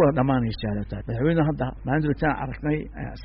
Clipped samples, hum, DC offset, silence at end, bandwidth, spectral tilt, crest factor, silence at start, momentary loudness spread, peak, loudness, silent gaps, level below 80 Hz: under 0.1%; none; under 0.1%; 0 s; 5.4 kHz; -7 dB/octave; 14 dB; 0 s; 8 LU; -10 dBFS; -25 LUFS; none; -38 dBFS